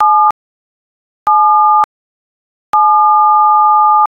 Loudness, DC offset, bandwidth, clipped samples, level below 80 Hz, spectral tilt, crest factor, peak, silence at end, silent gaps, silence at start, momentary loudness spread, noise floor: -9 LUFS; under 0.1%; 5.2 kHz; under 0.1%; -60 dBFS; -3 dB/octave; 10 dB; 0 dBFS; 0.05 s; 0.31-1.26 s, 1.84-2.73 s; 0 s; 9 LU; under -90 dBFS